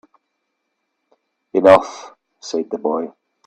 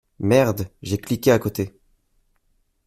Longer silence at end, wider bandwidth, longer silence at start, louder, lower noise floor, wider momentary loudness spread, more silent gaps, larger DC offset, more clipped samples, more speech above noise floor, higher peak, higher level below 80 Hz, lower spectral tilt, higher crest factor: second, 0.4 s vs 1.2 s; second, 8.8 kHz vs 16 kHz; first, 1.55 s vs 0.2 s; first, -17 LUFS vs -21 LUFS; first, -74 dBFS vs -66 dBFS; first, 22 LU vs 11 LU; neither; neither; neither; first, 58 dB vs 46 dB; about the same, 0 dBFS vs -2 dBFS; second, -64 dBFS vs -52 dBFS; about the same, -5 dB/octave vs -6 dB/octave; about the same, 20 dB vs 20 dB